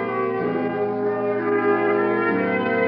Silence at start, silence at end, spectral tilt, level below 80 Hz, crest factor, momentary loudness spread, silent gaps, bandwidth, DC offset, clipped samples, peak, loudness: 0 s; 0 s; -5 dB/octave; -72 dBFS; 14 dB; 4 LU; none; 5.4 kHz; under 0.1%; under 0.1%; -8 dBFS; -22 LUFS